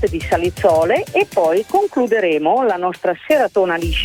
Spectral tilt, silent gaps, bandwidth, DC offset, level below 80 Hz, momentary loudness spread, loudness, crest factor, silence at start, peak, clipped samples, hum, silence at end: -5.5 dB/octave; none; 17.5 kHz; under 0.1%; -34 dBFS; 4 LU; -16 LUFS; 14 dB; 0 s; -2 dBFS; under 0.1%; none; 0 s